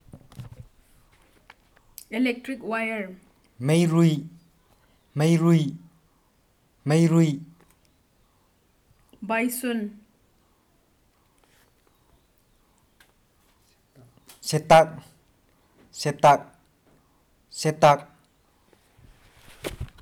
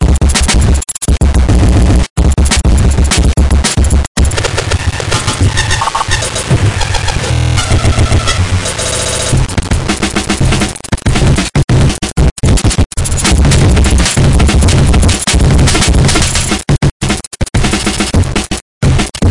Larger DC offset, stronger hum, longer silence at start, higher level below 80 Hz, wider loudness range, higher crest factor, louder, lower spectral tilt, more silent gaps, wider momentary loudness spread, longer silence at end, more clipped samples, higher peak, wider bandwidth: second, under 0.1% vs 2%; neither; first, 0.15 s vs 0 s; second, -56 dBFS vs -14 dBFS; first, 9 LU vs 3 LU; first, 24 dB vs 10 dB; second, -23 LUFS vs -11 LUFS; first, -6 dB/octave vs -4.5 dB/octave; second, none vs 2.10-2.16 s, 4.07-4.15 s, 11.64-11.68 s, 12.31-12.36 s, 12.86-12.90 s, 16.91-17.00 s, 17.27-17.31 s, 18.62-18.81 s; first, 25 LU vs 5 LU; first, 0.15 s vs 0 s; neither; about the same, -2 dBFS vs 0 dBFS; first, 16 kHz vs 11.5 kHz